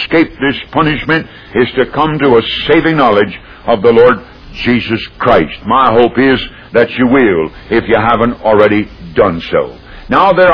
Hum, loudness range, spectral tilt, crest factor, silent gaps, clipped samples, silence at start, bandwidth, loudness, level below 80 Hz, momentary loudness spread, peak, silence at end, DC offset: none; 1 LU; -8 dB/octave; 10 dB; none; 0.4%; 0 s; 5.4 kHz; -11 LUFS; -34 dBFS; 7 LU; 0 dBFS; 0 s; under 0.1%